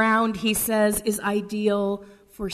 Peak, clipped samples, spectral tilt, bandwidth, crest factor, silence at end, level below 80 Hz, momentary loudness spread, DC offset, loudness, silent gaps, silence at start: -8 dBFS; under 0.1%; -4 dB/octave; 13.5 kHz; 16 dB; 0 s; -50 dBFS; 8 LU; under 0.1%; -23 LUFS; none; 0 s